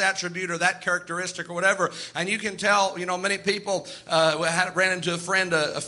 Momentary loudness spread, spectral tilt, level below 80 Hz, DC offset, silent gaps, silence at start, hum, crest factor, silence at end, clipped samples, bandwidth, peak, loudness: 8 LU; -2.5 dB/octave; -68 dBFS; under 0.1%; none; 0 s; none; 18 dB; 0 s; under 0.1%; 11.5 kHz; -6 dBFS; -24 LUFS